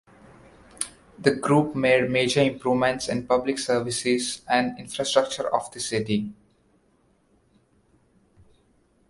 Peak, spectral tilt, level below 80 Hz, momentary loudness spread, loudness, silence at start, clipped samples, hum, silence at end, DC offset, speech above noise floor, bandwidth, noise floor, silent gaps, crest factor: -4 dBFS; -4.5 dB/octave; -58 dBFS; 9 LU; -24 LUFS; 0.8 s; under 0.1%; none; 2.75 s; under 0.1%; 41 dB; 11.5 kHz; -64 dBFS; none; 22 dB